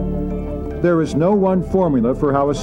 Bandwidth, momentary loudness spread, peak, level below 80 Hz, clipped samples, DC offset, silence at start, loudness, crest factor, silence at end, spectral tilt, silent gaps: 10.5 kHz; 9 LU; -4 dBFS; -32 dBFS; under 0.1%; under 0.1%; 0 s; -18 LUFS; 12 dB; 0 s; -8 dB/octave; none